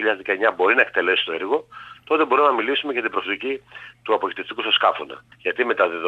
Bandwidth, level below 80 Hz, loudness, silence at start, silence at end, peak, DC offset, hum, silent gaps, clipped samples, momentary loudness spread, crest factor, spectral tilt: 7.4 kHz; -68 dBFS; -20 LUFS; 0 s; 0 s; -4 dBFS; under 0.1%; none; none; under 0.1%; 14 LU; 18 dB; -4.5 dB/octave